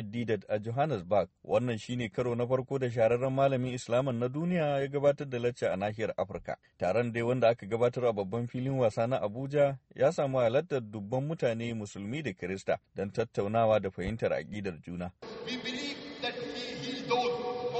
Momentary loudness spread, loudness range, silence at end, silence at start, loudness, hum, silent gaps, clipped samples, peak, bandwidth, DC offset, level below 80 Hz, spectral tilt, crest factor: 9 LU; 3 LU; 0 s; 0 s; -32 LUFS; none; none; under 0.1%; -12 dBFS; 8.4 kHz; under 0.1%; -62 dBFS; -6.5 dB/octave; 18 dB